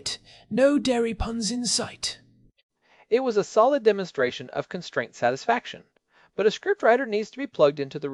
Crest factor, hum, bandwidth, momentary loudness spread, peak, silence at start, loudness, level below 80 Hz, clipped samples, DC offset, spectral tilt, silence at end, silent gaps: 20 dB; none; 12 kHz; 12 LU; -6 dBFS; 0.05 s; -24 LUFS; -48 dBFS; under 0.1%; under 0.1%; -3.5 dB/octave; 0 s; 2.63-2.69 s